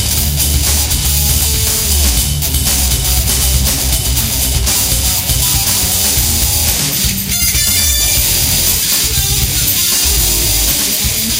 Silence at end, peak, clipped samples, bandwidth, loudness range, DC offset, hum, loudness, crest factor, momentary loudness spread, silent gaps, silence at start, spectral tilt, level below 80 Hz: 0 s; 0 dBFS; under 0.1%; 17 kHz; 2 LU; under 0.1%; none; -11 LUFS; 12 dB; 3 LU; none; 0 s; -2 dB/octave; -20 dBFS